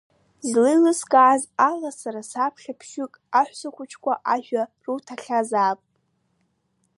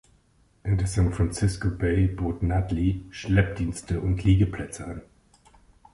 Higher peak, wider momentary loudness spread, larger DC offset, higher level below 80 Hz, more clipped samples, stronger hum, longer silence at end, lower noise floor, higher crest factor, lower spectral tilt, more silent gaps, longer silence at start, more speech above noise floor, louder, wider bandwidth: first, -4 dBFS vs -8 dBFS; first, 17 LU vs 12 LU; neither; second, -78 dBFS vs -34 dBFS; neither; neither; first, 1.2 s vs 0.95 s; first, -70 dBFS vs -62 dBFS; about the same, 20 dB vs 18 dB; second, -3.5 dB/octave vs -7 dB/octave; neither; second, 0.45 s vs 0.65 s; first, 48 dB vs 38 dB; first, -22 LUFS vs -26 LUFS; about the same, 11.5 kHz vs 11.5 kHz